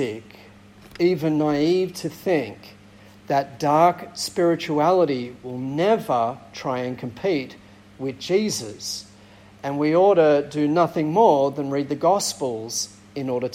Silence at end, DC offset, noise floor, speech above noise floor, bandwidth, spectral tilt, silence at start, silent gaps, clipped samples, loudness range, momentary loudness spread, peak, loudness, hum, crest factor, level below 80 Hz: 0 s; under 0.1%; -48 dBFS; 27 dB; 16.5 kHz; -5 dB/octave; 0 s; none; under 0.1%; 6 LU; 13 LU; -4 dBFS; -22 LUFS; none; 18 dB; -62 dBFS